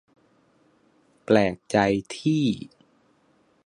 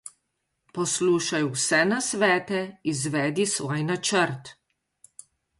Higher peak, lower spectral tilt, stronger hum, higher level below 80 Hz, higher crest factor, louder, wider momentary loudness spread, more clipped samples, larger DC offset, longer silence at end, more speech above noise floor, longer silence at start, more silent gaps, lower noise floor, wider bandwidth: first, -4 dBFS vs -8 dBFS; first, -6 dB/octave vs -3.5 dB/octave; neither; first, -58 dBFS vs -68 dBFS; about the same, 22 dB vs 18 dB; about the same, -24 LUFS vs -24 LUFS; first, 16 LU vs 8 LU; neither; neither; about the same, 1 s vs 1.05 s; second, 41 dB vs 53 dB; first, 1.3 s vs 0.05 s; neither; second, -63 dBFS vs -78 dBFS; about the same, 11 kHz vs 11.5 kHz